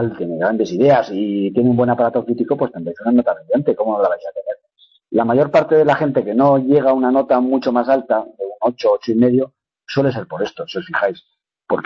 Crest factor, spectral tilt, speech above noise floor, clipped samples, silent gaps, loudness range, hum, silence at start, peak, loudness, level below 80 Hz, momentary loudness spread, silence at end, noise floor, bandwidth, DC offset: 14 dB; -8 dB/octave; 39 dB; under 0.1%; none; 4 LU; none; 0 s; -2 dBFS; -17 LUFS; -58 dBFS; 10 LU; 0 s; -55 dBFS; 6.6 kHz; under 0.1%